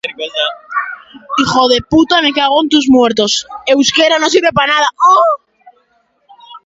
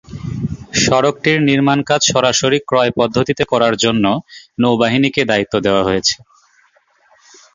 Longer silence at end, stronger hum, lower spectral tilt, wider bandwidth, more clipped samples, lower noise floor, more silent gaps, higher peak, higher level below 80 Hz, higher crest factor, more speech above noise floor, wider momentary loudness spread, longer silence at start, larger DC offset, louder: second, 0.05 s vs 1.4 s; neither; about the same, -3 dB/octave vs -4 dB/octave; about the same, 8 kHz vs 7.6 kHz; neither; about the same, -58 dBFS vs -55 dBFS; neither; about the same, 0 dBFS vs 0 dBFS; about the same, -46 dBFS vs -44 dBFS; about the same, 12 dB vs 16 dB; first, 46 dB vs 41 dB; about the same, 11 LU vs 9 LU; about the same, 0.05 s vs 0.1 s; neither; first, -11 LUFS vs -14 LUFS